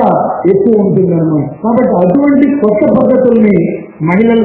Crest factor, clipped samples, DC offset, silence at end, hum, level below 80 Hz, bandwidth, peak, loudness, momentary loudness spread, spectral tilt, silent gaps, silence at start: 8 dB; 0.8%; under 0.1%; 0 s; none; -42 dBFS; 4 kHz; 0 dBFS; -9 LUFS; 5 LU; -12.5 dB/octave; none; 0 s